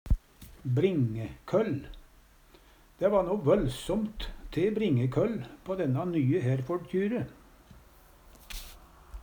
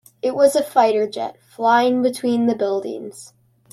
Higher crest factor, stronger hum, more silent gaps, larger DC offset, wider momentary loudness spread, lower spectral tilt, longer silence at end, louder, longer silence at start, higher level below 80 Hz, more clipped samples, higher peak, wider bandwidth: about the same, 18 dB vs 16 dB; neither; neither; neither; about the same, 16 LU vs 14 LU; first, -7.5 dB/octave vs -4.5 dB/octave; second, 0 s vs 0.45 s; second, -30 LUFS vs -18 LUFS; second, 0.05 s vs 0.25 s; first, -42 dBFS vs -66 dBFS; neither; second, -12 dBFS vs -4 dBFS; first, over 20 kHz vs 14.5 kHz